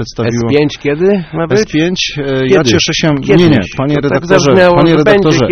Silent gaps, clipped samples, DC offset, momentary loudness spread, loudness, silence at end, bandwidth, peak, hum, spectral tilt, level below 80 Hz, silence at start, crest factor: none; 0.8%; under 0.1%; 7 LU; -10 LUFS; 0 s; 8.4 kHz; 0 dBFS; none; -5.5 dB/octave; -34 dBFS; 0 s; 10 dB